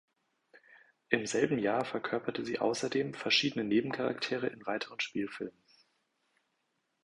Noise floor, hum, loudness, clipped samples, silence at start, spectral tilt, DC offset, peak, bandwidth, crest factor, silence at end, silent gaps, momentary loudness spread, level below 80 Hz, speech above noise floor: -80 dBFS; none; -33 LUFS; under 0.1%; 0.7 s; -4 dB/octave; under 0.1%; -10 dBFS; 11.5 kHz; 26 dB; 1.55 s; none; 9 LU; -74 dBFS; 47 dB